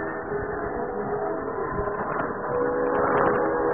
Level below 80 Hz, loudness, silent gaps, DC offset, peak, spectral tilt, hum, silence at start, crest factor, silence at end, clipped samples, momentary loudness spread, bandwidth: -46 dBFS; -26 LUFS; none; 0.3%; -6 dBFS; -11.5 dB/octave; none; 0 s; 18 dB; 0 s; under 0.1%; 8 LU; 3.4 kHz